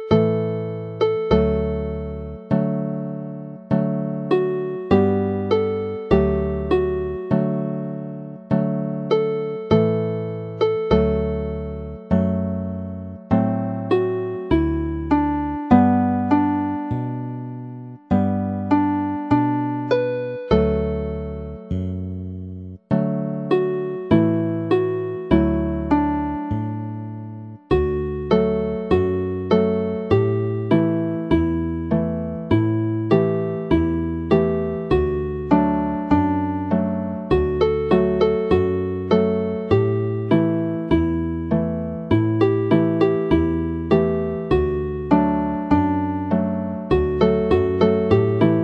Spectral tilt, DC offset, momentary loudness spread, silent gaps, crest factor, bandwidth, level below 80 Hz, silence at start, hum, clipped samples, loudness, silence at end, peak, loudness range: -10 dB/octave; under 0.1%; 10 LU; none; 20 dB; 6.2 kHz; -36 dBFS; 0 s; none; under 0.1%; -21 LUFS; 0 s; 0 dBFS; 3 LU